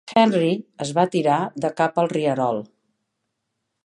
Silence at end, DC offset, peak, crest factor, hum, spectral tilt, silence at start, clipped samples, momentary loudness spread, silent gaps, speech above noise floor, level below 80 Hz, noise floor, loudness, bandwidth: 1.2 s; under 0.1%; -4 dBFS; 18 dB; none; -6 dB/octave; 0.05 s; under 0.1%; 8 LU; none; 57 dB; -68 dBFS; -78 dBFS; -21 LUFS; 11 kHz